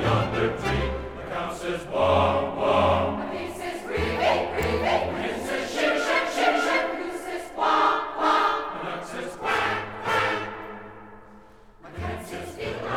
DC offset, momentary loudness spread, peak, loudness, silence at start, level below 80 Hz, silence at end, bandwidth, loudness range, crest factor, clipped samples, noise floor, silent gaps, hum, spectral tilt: 0.2%; 13 LU; -8 dBFS; -25 LUFS; 0 s; -44 dBFS; 0 s; 18 kHz; 5 LU; 18 dB; under 0.1%; -50 dBFS; none; none; -5 dB/octave